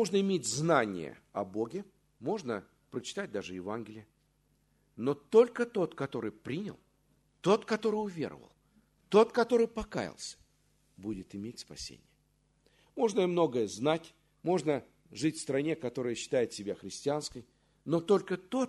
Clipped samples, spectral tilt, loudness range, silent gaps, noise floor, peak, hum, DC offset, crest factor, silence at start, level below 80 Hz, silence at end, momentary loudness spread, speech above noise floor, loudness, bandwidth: under 0.1%; -5 dB/octave; 8 LU; none; -72 dBFS; -10 dBFS; none; under 0.1%; 22 dB; 0 s; -66 dBFS; 0 s; 16 LU; 40 dB; -32 LUFS; 12 kHz